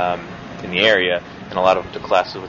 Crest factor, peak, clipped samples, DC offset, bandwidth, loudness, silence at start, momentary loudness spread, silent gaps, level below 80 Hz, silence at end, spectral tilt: 18 dB; -2 dBFS; under 0.1%; under 0.1%; 7.4 kHz; -18 LUFS; 0 s; 13 LU; none; -50 dBFS; 0 s; -4.5 dB/octave